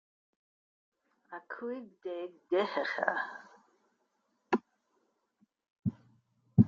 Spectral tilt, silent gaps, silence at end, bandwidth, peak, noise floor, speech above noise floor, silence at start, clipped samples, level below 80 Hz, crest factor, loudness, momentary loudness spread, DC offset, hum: -8.5 dB/octave; 5.70-5.76 s; 0 s; 7.2 kHz; -10 dBFS; -78 dBFS; 43 dB; 1.3 s; under 0.1%; -66 dBFS; 26 dB; -36 LUFS; 13 LU; under 0.1%; none